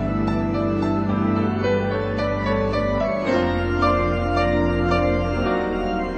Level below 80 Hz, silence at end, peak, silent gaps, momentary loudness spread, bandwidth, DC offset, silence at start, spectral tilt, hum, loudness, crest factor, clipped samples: -34 dBFS; 0 s; -6 dBFS; none; 3 LU; 8.8 kHz; under 0.1%; 0 s; -8 dB/octave; none; -21 LUFS; 14 dB; under 0.1%